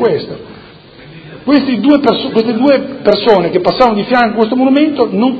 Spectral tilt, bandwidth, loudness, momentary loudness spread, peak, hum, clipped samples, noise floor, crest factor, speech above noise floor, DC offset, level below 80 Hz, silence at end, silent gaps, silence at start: -7.5 dB/octave; 6.6 kHz; -11 LUFS; 5 LU; 0 dBFS; none; 0.4%; -36 dBFS; 12 dB; 25 dB; under 0.1%; -48 dBFS; 0 s; none; 0 s